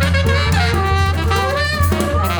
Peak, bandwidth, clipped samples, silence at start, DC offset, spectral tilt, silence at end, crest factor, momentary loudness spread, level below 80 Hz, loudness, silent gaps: -4 dBFS; over 20 kHz; under 0.1%; 0 s; under 0.1%; -5.5 dB/octave; 0 s; 12 dB; 2 LU; -24 dBFS; -16 LUFS; none